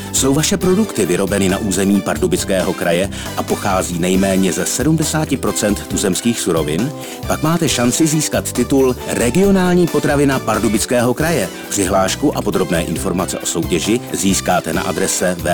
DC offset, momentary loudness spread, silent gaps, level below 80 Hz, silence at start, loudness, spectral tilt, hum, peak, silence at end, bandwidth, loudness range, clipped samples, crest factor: under 0.1%; 5 LU; none; -34 dBFS; 0 s; -16 LUFS; -4.5 dB/octave; none; -4 dBFS; 0 s; over 20 kHz; 2 LU; under 0.1%; 12 dB